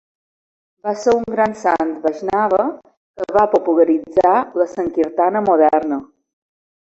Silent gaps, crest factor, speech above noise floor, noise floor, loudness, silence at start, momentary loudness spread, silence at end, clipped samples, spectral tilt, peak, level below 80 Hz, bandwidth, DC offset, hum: 2.97-3.14 s; 16 dB; over 74 dB; under -90 dBFS; -17 LUFS; 0.85 s; 9 LU; 0.8 s; under 0.1%; -6 dB/octave; -2 dBFS; -54 dBFS; 8 kHz; under 0.1%; none